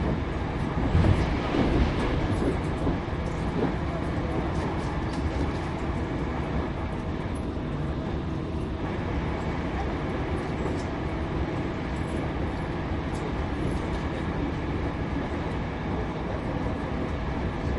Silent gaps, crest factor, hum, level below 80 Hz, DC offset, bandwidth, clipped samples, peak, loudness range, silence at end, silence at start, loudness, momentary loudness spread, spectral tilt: none; 18 dB; none; -34 dBFS; under 0.1%; 11.5 kHz; under 0.1%; -10 dBFS; 4 LU; 0 s; 0 s; -29 LUFS; 5 LU; -7.5 dB/octave